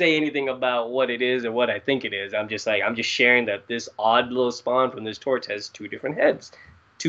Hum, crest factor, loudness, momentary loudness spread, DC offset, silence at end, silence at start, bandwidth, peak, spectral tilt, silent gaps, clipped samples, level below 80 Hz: none; 20 dB; -23 LUFS; 11 LU; under 0.1%; 0 s; 0 s; 8 kHz; -4 dBFS; -4 dB/octave; none; under 0.1%; -68 dBFS